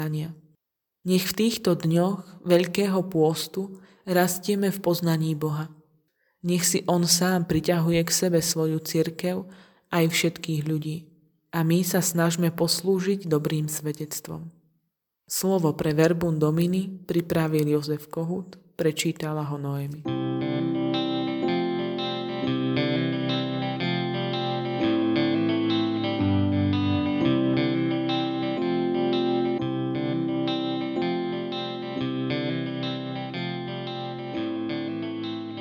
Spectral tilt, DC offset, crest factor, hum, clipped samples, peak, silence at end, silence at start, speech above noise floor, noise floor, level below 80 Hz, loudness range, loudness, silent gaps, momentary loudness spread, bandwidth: -5 dB/octave; under 0.1%; 20 dB; none; under 0.1%; -6 dBFS; 0 s; 0 s; 54 dB; -78 dBFS; -60 dBFS; 4 LU; -25 LUFS; none; 9 LU; 19 kHz